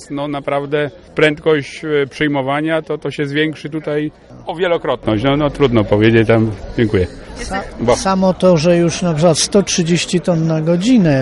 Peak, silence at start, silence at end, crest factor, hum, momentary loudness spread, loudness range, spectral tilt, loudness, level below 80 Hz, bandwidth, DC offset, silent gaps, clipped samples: 0 dBFS; 0 s; 0 s; 14 dB; none; 10 LU; 5 LU; -5.5 dB/octave; -15 LUFS; -38 dBFS; 11.5 kHz; under 0.1%; none; under 0.1%